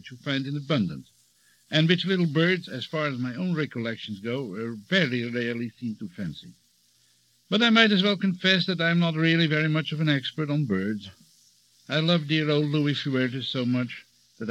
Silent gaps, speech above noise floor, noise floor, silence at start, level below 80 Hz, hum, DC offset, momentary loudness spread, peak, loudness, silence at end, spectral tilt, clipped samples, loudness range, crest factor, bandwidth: none; 39 dB; -64 dBFS; 0.05 s; -72 dBFS; none; under 0.1%; 13 LU; -4 dBFS; -25 LUFS; 0 s; -6.5 dB/octave; under 0.1%; 7 LU; 22 dB; 9.2 kHz